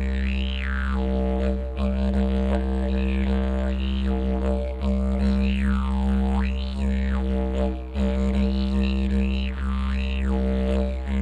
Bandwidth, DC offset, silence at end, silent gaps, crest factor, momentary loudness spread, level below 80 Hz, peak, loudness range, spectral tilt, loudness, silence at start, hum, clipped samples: 7.4 kHz; under 0.1%; 0 s; none; 12 dB; 4 LU; -24 dBFS; -10 dBFS; 1 LU; -8 dB/octave; -25 LUFS; 0 s; none; under 0.1%